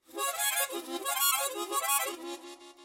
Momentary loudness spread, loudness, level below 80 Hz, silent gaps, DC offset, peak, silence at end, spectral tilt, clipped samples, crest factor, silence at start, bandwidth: 15 LU; -29 LUFS; -82 dBFS; none; under 0.1%; -14 dBFS; 0 s; 2 dB/octave; under 0.1%; 20 dB; 0.1 s; 16.5 kHz